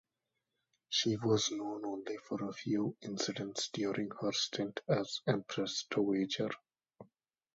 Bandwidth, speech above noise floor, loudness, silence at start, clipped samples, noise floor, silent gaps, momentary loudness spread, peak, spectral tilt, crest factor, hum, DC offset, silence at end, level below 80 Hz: 7.6 kHz; 52 dB; -36 LUFS; 0.9 s; under 0.1%; -88 dBFS; none; 8 LU; -16 dBFS; -4 dB/octave; 20 dB; none; under 0.1%; 0.5 s; -76 dBFS